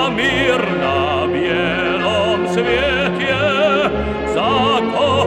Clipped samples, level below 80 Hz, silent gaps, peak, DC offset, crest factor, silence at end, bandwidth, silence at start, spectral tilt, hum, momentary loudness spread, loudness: under 0.1%; -36 dBFS; none; -2 dBFS; under 0.1%; 14 dB; 0 s; 11.5 kHz; 0 s; -5.5 dB/octave; none; 3 LU; -16 LUFS